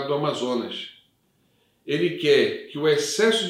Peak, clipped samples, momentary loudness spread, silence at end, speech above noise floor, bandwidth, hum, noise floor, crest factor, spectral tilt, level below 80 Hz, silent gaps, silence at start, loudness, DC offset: -8 dBFS; under 0.1%; 14 LU; 0 s; 43 dB; 15.5 kHz; none; -66 dBFS; 16 dB; -4 dB/octave; -74 dBFS; none; 0 s; -23 LUFS; under 0.1%